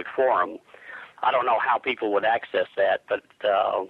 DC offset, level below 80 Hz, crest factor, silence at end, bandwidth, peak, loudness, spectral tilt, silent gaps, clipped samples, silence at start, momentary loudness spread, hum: under 0.1%; -72 dBFS; 14 dB; 0 s; 5.4 kHz; -10 dBFS; -24 LUFS; -5.5 dB/octave; none; under 0.1%; 0 s; 15 LU; none